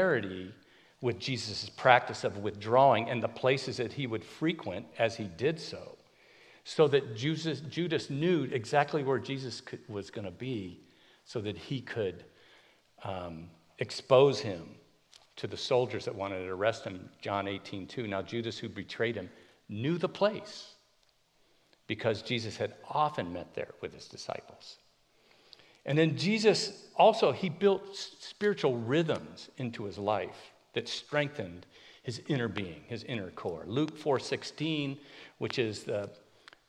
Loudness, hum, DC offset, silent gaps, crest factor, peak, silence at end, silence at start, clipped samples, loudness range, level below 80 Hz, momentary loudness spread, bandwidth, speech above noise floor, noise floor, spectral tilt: -32 LUFS; none; under 0.1%; none; 28 dB; -6 dBFS; 0.55 s; 0 s; under 0.1%; 8 LU; -72 dBFS; 17 LU; 11 kHz; 38 dB; -70 dBFS; -5.5 dB/octave